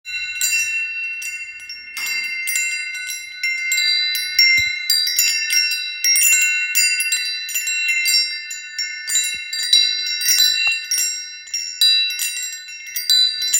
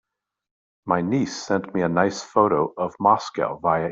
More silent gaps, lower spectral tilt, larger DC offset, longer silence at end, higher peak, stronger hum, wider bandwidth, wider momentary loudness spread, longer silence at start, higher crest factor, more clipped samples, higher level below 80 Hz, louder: neither; second, 5 dB/octave vs -6 dB/octave; neither; about the same, 0 s vs 0 s; about the same, -2 dBFS vs -4 dBFS; neither; first, 17 kHz vs 8 kHz; first, 13 LU vs 6 LU; second, 0.05 s vs 0.85 s; about the same, 18 dB vs 20 dB; neither; about the same, -64 dBFS vs -60 dBFS; first, -16 LUFS vs -22 LUFS